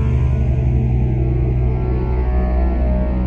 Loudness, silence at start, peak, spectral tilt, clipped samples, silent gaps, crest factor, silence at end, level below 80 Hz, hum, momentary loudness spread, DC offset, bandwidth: -18 LUFS; 0 s; -6 dBFS; -11 dB/octave; under 0.1%; none; 10 dB; 0 s; -18 dBFS; none; 2 LU; under 0.1%; 3.3 kHz